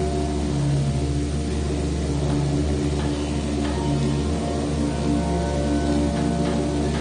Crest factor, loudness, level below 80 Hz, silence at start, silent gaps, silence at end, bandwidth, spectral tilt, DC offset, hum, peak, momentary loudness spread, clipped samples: 12 dB; -23 LUFS; -28 dBFS; 0 s; none; 0 s; 10 kHz; -6.5 dB/octave; under 0.1%; none; -12 dBFS; 3 LU; under 0.1%